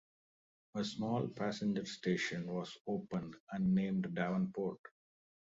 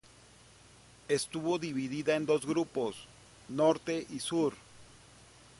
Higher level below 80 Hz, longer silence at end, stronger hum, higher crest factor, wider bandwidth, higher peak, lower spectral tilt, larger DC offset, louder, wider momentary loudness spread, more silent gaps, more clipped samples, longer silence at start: about the same, -72 dBFS vs -68 dBFS; about the same, 0.7 s vs 0.75 s; neither; about the same, 16 dB vs 20 dB; second, 7.6 kHz vs 11.5 kHz; second, -22 dBFS vs -14 dBFS; about the same, -6 dB/octave vs -5 dB/octave; neither; second, -38 LUFS vs -33 LUFS; second, 8 LU vs 15 LU; first, 2.81-2.85 s, 3.40-3.47 s, 4.79-4.84 s vs none; neither; second, 0.75 s vs 1.1 s